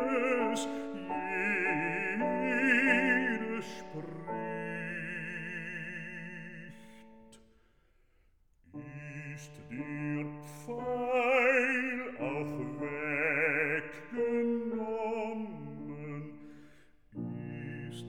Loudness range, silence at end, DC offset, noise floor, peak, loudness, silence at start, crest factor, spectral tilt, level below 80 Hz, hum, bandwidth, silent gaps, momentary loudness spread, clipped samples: 15 LU; 0 s; 0.2%; -68 dBFS; -12 dBFS; -33 LUFS; 0 s; 22 dB; -5.5 dB/octave; -68 dBFS; none; 16.5 kHz; none; 18 LU; under 0.1%